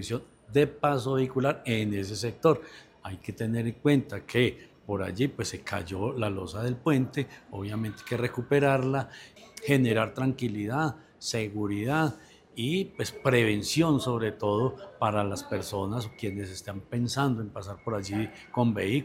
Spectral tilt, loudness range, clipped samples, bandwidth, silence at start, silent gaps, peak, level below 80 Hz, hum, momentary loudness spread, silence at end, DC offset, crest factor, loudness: -6 dB/octave; 4 LU; under 0.1%; 16 kHz; 0 s; none; -8 dBFS; -60 dBFS; none; 12 LU; 0 s; under 0.1%; 20 dB; -29 LUFS